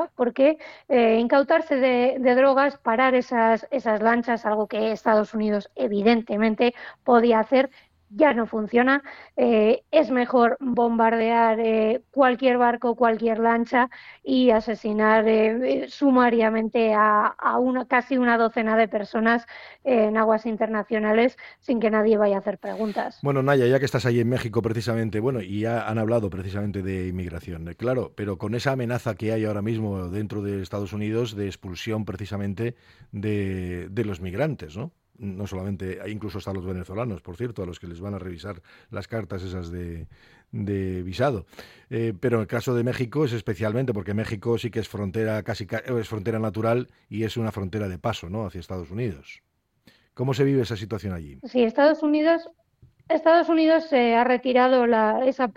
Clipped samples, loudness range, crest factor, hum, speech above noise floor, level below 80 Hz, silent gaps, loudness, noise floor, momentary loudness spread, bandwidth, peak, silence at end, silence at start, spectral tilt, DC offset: under 0.1%; 10 LU; 18 dB; none; 37 dB; -54 dBFS; none; -23 LUFS; -60 dBFS; 14 LU; 15 kHz; -4 dBFS; 0.05 s; 0 s; -7 dB/octave; under 0.1%